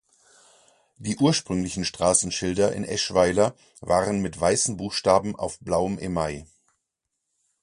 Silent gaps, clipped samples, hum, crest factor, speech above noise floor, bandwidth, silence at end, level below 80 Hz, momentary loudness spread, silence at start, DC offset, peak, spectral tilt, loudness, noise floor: none; under 0.1%; none; 22 dB; 57 dB; 11.5 kHz; 1.2 s; -48 dBFS; 10 LU; 1 s; under 0.1%; -4 dBFS; -4 dB/octave; -24 LUFS; -81 dBFS